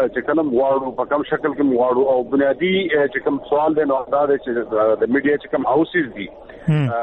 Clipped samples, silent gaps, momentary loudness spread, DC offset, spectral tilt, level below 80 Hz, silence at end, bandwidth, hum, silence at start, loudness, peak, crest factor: under 0.1%; none; 5 LU; under 0.1%; -9 dB/octave; -52 dBFS; 0 s; 4.1 kHz; none; 0 s; -19 LUFS; -6 dBFS; 14 dB